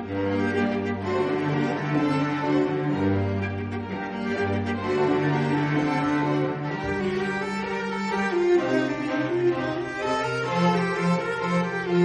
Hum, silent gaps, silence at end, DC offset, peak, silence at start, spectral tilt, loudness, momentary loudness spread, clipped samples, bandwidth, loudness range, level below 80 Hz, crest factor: none; none; 0 s; under 0.1%; -10 dBFS; 0 s; -7 dB/octave; -25 LUFS; 6 LU; under 0.1%; 11 kHz; 1 LU; -56 dBFS; 14 dB